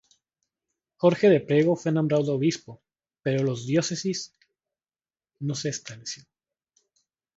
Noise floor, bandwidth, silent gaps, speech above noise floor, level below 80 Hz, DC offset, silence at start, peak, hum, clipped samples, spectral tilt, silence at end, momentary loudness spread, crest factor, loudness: under -90 dBFS; 8 kHz; none; over 66 dB; -68 dBFS; under 0.1%; 1 s; -6 dBFS; none; under 0.1%; -5.5 dB/octave; 1.2 s; 16 LU; 20 dB; -25 LUFS